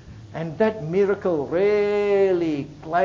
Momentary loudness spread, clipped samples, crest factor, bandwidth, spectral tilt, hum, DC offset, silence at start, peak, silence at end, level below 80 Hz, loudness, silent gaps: 11 LU; under 0.1%; 14 dB; 7.4 kHz; -7.5 dB/octave; none; under 0.1%; 0.05 s; -8 dBFS; 0 s; -52 dBFS; -22 LUFS; none